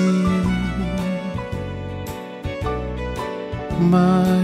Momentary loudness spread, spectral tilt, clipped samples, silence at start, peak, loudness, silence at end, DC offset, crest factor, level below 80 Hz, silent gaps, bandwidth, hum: 14 LU; -7.5 dB/octave; under 0.1%; 0 s; -6 dBFS; -22 LUFS; 0 s; under 0.1%; 14 dB; -34 dBFS; none; 13.5 kHz; none